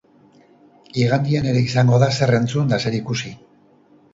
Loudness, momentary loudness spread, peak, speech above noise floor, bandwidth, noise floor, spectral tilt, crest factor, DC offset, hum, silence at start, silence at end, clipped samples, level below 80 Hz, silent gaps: -19 LUFS; 11 LU; -2 dBFS; 35 dB; 7.8 kHz; -53 dBFS; -6.5 dB/octave; 18 dB; under 0.1%; none; 0.95 s; 0.8 s; under 0.1%; -52 dBFS; none